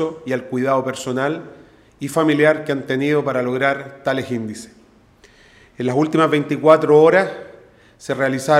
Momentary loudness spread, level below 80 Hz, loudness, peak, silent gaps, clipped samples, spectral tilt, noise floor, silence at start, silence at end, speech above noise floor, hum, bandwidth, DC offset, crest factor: 14 LU; -62 dBFS; -18 LUFS; 0 dBFS; none; under 0.1%; -6 dB/octave; -50 dBFS; 0 s; 0 s; 33 dB; none; 14.5 kHz; under 0.1%; 18 dB